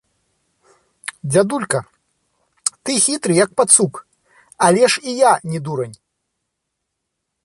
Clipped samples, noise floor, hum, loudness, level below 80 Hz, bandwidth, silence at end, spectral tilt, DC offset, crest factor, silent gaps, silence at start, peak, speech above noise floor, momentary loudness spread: under 0.1%; -77 dBFS; none; -16 LUFS; -62 dBFS; 12.5 kHz; 1.5 s; -3.5 dB/octave; under 0.1%; 20 dB; none; 1.25 s; 0 dBFS; 61 dB; 16 LU